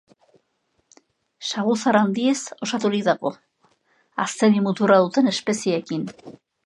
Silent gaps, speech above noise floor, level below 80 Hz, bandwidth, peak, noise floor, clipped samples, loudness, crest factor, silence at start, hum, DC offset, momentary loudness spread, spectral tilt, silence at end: none; 50 dB; -72 dBFS; 11.5 kHz; -2 dBFS; -70 dBFS; under 0.1%; -21 LUFS; 20 dB; 1.4 s; none; under 0.1%; 12 LU; -5 dB/octave; 0.35 s